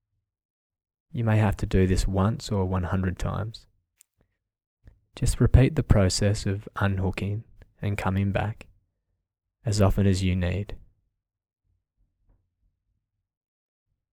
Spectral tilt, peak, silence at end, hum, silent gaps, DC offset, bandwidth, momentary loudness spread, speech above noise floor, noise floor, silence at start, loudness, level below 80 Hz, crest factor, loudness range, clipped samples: -6.5 dB/octave; -4 dBFS; 3.35 s; none; 4.67-4.77 s; under 0.1%; 14.5 kHz; 12 LU; 57 dB; -81 dBFS; 1.15 s; -25 LUFS; -36 dBFS; 22 dB; 5 LU; under 0.1%